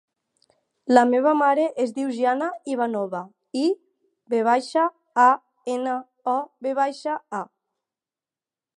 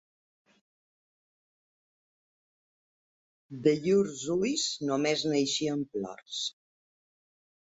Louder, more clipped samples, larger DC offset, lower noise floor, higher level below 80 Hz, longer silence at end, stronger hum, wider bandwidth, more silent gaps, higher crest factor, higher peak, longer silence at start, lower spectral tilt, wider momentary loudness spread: first, -23 LUFS vs -29 LUFS; neither; neither; about the same, under -90 dBFS vs under -90 dBFS; second, -82 dBFS vs -72 dBFS; about the same, 1.3 s vs 1.25 s; neither; first, 11 kHz vs 8 kHz; neither; about the same, 22 dB vs 22 dB; first, 0 dBFS vs -10 dBFS; second, 0.85 s vs 3.5 s; about the same, -4.5 dB/octave vs -4 dB/octave; first, 13 LU vs 10 LU